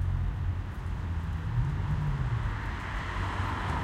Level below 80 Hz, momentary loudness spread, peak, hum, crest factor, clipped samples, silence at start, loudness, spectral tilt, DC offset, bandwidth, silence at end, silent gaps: -36 dBFS; 4 LU; -16 dBFS; none; 14 dB; under 0.1%; 0 s; -33 LUFS; -7 dB/octave; under 0.1%; 10 kHz; 0 s; none